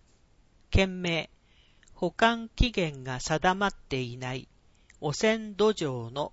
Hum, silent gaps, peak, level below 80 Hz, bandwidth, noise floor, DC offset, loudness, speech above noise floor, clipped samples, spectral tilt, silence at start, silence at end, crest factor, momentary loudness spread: none; none; -8 dBFS; -40 dBFS; 8 kHz; -62 dBFS; under 0.1%; -29 LUFS; 34 dB; under 0.1%; -5 dB/octave; 0.7 s; 0.05 s; 22 dB; 10 LU